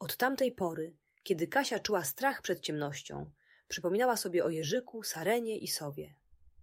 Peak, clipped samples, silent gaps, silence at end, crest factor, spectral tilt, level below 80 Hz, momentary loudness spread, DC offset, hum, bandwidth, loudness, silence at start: -16 dBFS; under 0.1%; none; 0.15 s; 18 dB; -3.5 dB/octave; -70 dBFS; 14 LU; under 0.1%; none; 16 kHz; -34 LUFS; 0 s